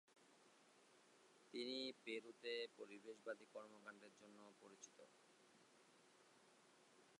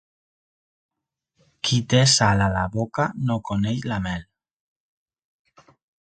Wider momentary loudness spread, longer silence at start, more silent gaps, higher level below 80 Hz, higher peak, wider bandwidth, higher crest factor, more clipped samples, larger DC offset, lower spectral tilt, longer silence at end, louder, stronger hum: first, 16 LU vs 11 LU; second, 0.1 s vs 1.65 s; neither; second, under -90 dBFS vs -46 dBFS; second, -36 dBFS vs -2 dBFS; first, 11 kHz vs 9.4 kHz; about the same, 22 dB vs 22 dB; neither; neither; second, -2.5 dB/octave vs -4 dB/octave; second, 0.05 s vs 1.8 s; second, -53 LUFS vs -21 LUFS; neither